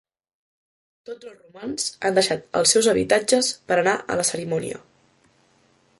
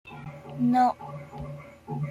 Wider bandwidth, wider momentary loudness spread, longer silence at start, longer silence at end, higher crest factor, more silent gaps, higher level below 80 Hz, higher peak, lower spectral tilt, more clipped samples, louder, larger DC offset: about the same, 12 kHz vs 11.5 kHz; about the same, 21 LU vs 19 LU; first, 1.1 s vs 0.05 s; first, 1.2 s vs 0 s; first, 24 dB vs 16 dB; neither; about the same, -60 dBFS vs -58 dBFS; first, 0 dBFS vs -12 dBFS; second, -2.5 dB/octave vs -8 dB/octave; neither; first, -21 LUFS vs -26 LUFS; neither